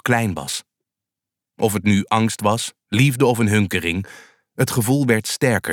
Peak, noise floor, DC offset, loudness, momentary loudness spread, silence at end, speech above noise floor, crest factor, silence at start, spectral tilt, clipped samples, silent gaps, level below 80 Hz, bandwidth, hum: -4 dBFS; -86 dBFS; under 0.1%; -19 LUFS; 10 LU; 0 s; 67 dB; 16 dB; 0.05 s; -5 dB/octave; under 0.1%; none; -54 dBFS; 18.5 kHz; none